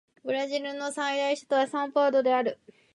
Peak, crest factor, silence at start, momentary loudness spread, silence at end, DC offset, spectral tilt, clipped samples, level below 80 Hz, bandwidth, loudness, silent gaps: -12 dBFS; 16 dB; 0.25 s; 9 LU; 0.4 s; under 0.1%; -3 dB/octave; under 0.1%; -82 dBFS; 11.5 kHz; -27 LUFS; none